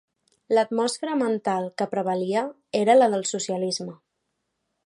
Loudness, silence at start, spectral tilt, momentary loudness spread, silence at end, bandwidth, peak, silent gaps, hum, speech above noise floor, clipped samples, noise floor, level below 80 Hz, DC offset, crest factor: -24 LUFS; 0.5 s; -4 dB/octave; 10 LU; 0.9 s; 11.5 kHz; -6 dBFS; none; none; 55 dB; under 0.1%; -78 dBFS; -78 dBFS; under 0.1%; 18 dB